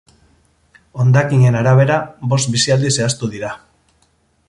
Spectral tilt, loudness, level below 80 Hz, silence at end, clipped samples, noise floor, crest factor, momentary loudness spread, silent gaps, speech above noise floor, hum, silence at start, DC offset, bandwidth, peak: -5 dB/octave; -15 LUFS; -50 dBFS; 0.9 s; under 0.1%; -59 dBFS; 14 dB; 15 LU; none; 45 dB; none; 0.95 s; under 0.1%; 11.5 kHz; -2 dBFS